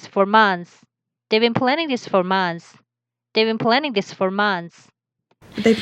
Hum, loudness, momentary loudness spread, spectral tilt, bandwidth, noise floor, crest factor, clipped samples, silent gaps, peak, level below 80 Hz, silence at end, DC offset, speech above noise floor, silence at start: none; -19 LUFS; 11 LU; -5.5 dB/octave; 10 kHz; -85 dBFS; 20 dB; under 0.1%; none; -2 dBFS; -66 dBFS; 0 s; under 0.1%; 66 dB; 0.05 s